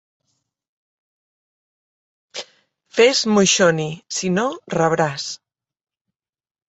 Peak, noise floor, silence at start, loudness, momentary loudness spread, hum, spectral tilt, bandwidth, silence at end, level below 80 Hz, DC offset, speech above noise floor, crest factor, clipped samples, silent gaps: -2 dBFS; under -90 dBFS; 2.35 s; -18 LUFS; 19 LU; none; -3.5 dB/octave; 8.2 kHz; 1.35 s; -62 dBFS; under 0.1%; over 72 dB; 20 dB; under 0.1%; none